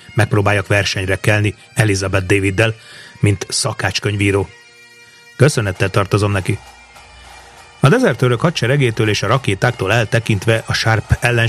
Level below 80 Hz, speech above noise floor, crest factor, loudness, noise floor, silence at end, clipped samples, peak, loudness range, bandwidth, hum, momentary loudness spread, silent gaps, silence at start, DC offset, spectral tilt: -40 dBFS; 28 dB; 16 dB; -16 LUFS; -43 dBFS; 0 s; under 0.1%; 0 dBFS; 3 LU; 14.5 kHz; none; 4 LU; none; 0.1 s; under 0.1%; -5 dB/octave